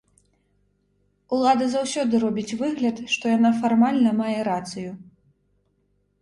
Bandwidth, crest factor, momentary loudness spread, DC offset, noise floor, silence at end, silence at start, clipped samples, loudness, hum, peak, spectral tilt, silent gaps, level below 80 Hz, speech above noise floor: 11 kHz; 18 dB; 10 LU; under 0.1%; -68 dBFS; 1.2 s; 1.3 s; under 0.1%; -22 LUFS; none; -6 dBFS; -5 dB/octave; none; -64 dBFS; 47 dB